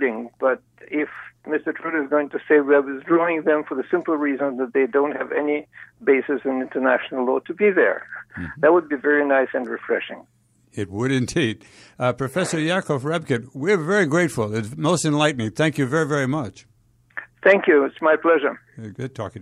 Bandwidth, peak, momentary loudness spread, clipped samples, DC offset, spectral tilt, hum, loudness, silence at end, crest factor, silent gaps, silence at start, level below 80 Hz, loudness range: 13.5 kHz; -4 dBFS; 13 LU; under 0.1%; under 0.1%; -5.5 dB/octave; none; -21 LUFS; 0 s; 18 dB; none; 0 s; -60 dBFS; 3 LU